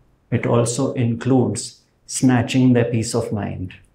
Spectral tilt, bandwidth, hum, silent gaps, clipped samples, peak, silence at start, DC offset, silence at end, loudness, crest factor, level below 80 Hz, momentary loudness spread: -6 dB/octave; 14 kHz; none; none; under 0.1%; -2 dBFS; 0.3 s; under 0.1%; 0.2 s; -19 LUFS; 16 dB; -52 dBFS; 12 LU